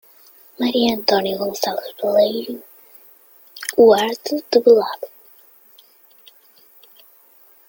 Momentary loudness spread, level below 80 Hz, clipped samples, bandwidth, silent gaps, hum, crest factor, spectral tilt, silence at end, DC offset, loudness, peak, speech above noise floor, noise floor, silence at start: 17 LU; -62 dBFS; under 0.1%; 17 kHz; none; none; 18 dB; -4 dB/octave; 2.6 s; under 0.1%; -17 LUFS; -2 dBFS; 34 dB; -51 dBFS; 0.6 s